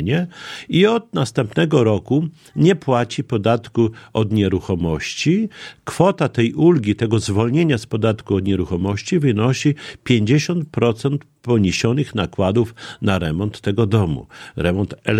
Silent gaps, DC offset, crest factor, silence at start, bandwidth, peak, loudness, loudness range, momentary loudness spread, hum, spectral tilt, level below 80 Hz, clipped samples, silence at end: none; under 0.1%; 18 dB; 0 s; 12 kHz; 0 dBFS; -19 LUFS; 2 LU; 7 LU; none; -6.5 dB/octave; -44 dBFS; under 0.1%; 0 s